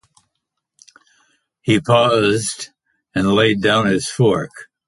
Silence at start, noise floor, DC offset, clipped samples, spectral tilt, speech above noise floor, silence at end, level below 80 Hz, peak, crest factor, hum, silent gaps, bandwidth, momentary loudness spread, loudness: 1.65 s; -77 dBFS; under 0.1%; under 0.1%; -5 dB/octave; 61 dB; 0.25 s; -50 dBFS; -2 dBFS; 16 dB; none; none; 11.5 kHz; 14 LU; -16 LUFS